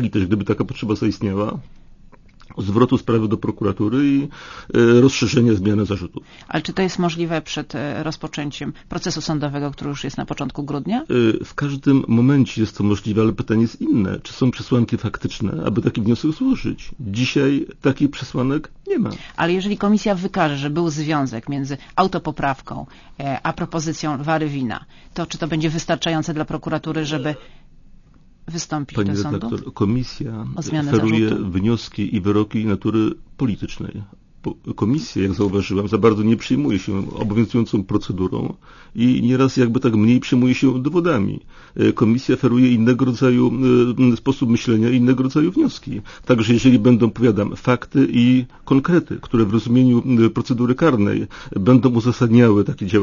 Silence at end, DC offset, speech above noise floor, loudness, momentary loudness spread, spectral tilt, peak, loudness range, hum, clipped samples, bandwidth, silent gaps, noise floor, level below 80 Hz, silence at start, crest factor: 0 s; under 0.1%; 28 dB; -19 LUFS; 12 LU; -7 dB/octave; 0 dBFS; 7 LU; none; under 0.1%; 7.4 kHz; none; -47 dBFS; -44 dBFS; 0 s; 18 dB